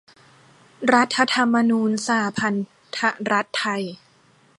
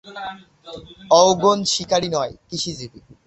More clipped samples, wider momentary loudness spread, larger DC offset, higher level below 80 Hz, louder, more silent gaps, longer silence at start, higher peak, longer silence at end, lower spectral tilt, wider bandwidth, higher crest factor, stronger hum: neither; second, 10 LU vs 24 LU; neither; second, -68 dBFS vs -54 dBFS; second, -21 LUFS vs -18 LUFS; neither; first, 0.8 s vs 0.05 s; about the same, -2 dBFS vs -2 dBFS; first, 0.65 s vs 0.4 s; about the same, -4 dB/octave vs -3.5 dB/octave; first, 11.5 kHz vs 8.4 kHz; about the same, 22 dB vs 20 dB; neither